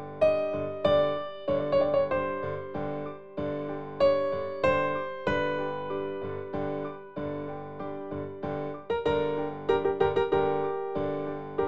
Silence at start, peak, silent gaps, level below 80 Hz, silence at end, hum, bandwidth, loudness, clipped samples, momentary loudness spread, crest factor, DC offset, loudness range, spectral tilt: 0 s; -12 dBFS; none; -56 dBFS; 0 s; none; 7.4 kHz; -29 LUFS; under 0.1%; 11 LU; 18 dB; 0.5%; 5 LU; -7.5 dB/octave